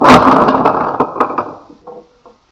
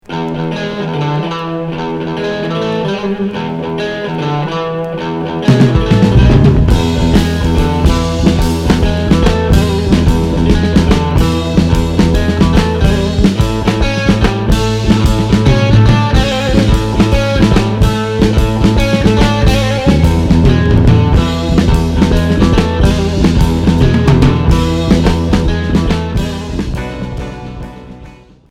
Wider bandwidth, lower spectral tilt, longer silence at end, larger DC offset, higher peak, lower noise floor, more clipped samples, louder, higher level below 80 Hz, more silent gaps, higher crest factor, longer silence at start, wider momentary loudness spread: about the same, 14 kHz vs 15 kHz; about the same, -6 dB/octave vs -7 dB/octave; first, 0.5 s vs 0.35 s; neither; about the same, 0 dBFS vs 0 dBFS; first, -45 dBFS vs -36 dBFS; first, 1% vs 0.4%; about the same, -11 LUFS vs -12 LUFS; second, -42 dBFS vs -18 dBFS; neither; about the same, 12 dB vs 10 dB; about the same, 0 s vs 0.1 s; first, 14 LU vs 9 LU